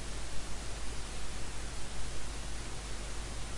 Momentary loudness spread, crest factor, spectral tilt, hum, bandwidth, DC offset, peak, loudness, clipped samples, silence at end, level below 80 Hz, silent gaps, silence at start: 0 LU; 12 dB; -3 dB/octave; none; 11.5 kHz; under 0.1%; -22 dBFS; -42 LUFS; under 0.1%; 0 s; -42 dBFS; none; 0 s